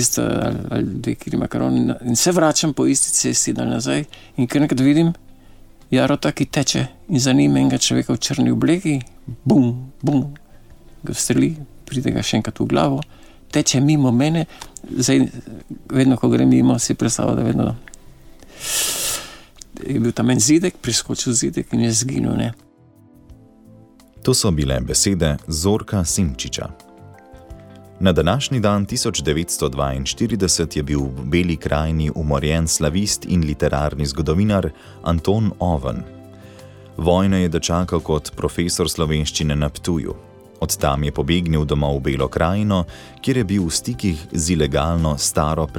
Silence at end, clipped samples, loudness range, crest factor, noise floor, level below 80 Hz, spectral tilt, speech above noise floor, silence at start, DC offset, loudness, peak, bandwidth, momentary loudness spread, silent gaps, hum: 0 s; under 0.1%; 4 LU; 16 dB; -49 dBFS; -34 dBFS; -4.5 dB/octave; 31 dB; 0 s; under 0.1%; -19 LUFS; -2 dBFS; 18 kHz; 9 LU; none; none